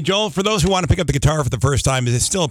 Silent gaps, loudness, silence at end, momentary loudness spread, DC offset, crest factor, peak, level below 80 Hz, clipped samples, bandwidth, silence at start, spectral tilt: none; -18 LUFS; 0 s; 2 LU; under 0.1%; 12 dB; -6 dBFS; -30 dBFS; under 0.1%; 16 kHz; 0 s; -4.5 dB/octave